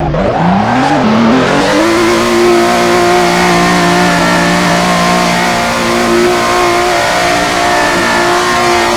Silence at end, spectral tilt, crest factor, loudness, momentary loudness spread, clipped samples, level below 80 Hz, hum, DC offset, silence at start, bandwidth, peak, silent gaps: 0 s; -4 dB/octave; 8 dB; -9 LUFS; 2 LU; 0.5%; -32 dBFS; none; under 0.1%; 0 s; 19 kHz; 0 dBFS; none